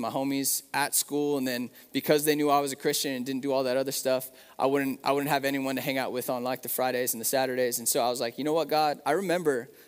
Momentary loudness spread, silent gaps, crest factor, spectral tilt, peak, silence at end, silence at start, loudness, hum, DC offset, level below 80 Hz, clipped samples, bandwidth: 6 LU; none; 20 dB; -3 dB/octave; -8 dBFS; 0.15 s; 0 s; -28 LUFS; none; under 0.1%; -78 dBFS; under 0.1%; 16 kHz